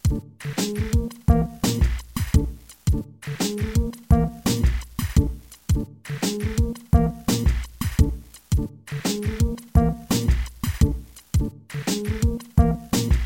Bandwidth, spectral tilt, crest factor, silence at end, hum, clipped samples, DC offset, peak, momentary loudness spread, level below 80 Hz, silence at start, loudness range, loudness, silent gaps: 17 kHz; -6 dB/octave; 20 dB; 0 s; none; under 0.1%; under 0.1%; -4 dBFS; 8 LU; -26 dBFS; 0.05 s; 1 LU; -24 LUFS; none